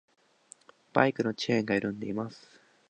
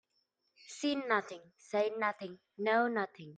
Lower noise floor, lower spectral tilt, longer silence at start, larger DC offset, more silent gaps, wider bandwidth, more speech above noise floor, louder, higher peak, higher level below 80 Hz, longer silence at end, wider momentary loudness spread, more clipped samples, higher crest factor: second, -58 dBFS vs -80 dBFS; first, -6 dB/octave vs -4 dB/octave; first, 0.95 s vs 0.7 s; neither; neither; about the same, 9.8 kHz vs 9.4 kHz; second, 29 dB vs 45 dB; first, -30 LUFS vs -34 LUFS; first, -4 dBFS vs -16 dBFS; first, -70 dBFS vs -86 dBFS; first, 0.5 s vs 0 s; second, 10 LU vs 18 LU; neither; first, 26 dB vs 20 dB